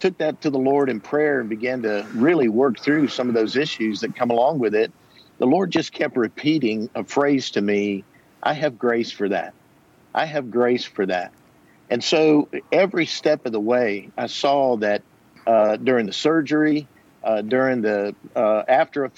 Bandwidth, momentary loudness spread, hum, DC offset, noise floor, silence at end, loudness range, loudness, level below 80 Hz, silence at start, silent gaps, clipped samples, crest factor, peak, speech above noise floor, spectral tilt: 8 kHz; 8 LU; none; under 0.1%; -55 dBFS; 0.1 s; 3 LU; -21 LUFS; -70 dBFS; 0 s; none; under 0.1%; 16 dB; -6 dBFS; 34 dB; -5.5 dB/octave